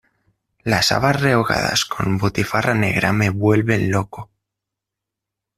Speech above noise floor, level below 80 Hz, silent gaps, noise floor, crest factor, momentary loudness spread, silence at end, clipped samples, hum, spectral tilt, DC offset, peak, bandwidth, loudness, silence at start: 66 dB; -46 dBFS; none; -84 dBFS; 18 dB; 6 LU; 1.35 s; under 0.1%; none; -5 dB/octave; under 0.1%; -2 dBFS; 14.5 kHz; -18 LUFS; 0.65 s